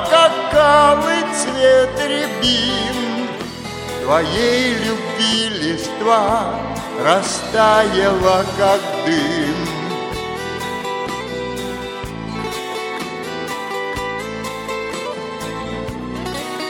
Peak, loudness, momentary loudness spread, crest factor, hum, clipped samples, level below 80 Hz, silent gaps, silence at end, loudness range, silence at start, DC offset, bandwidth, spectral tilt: 0 dBFS; -18 LUFS; 13 LU; 18 dB; none; under 0.1%; -42 dBFS; none; 0 s; 9 LU; 0 s; under 0.1%; 17.5 kHz; -3.5 dB/octave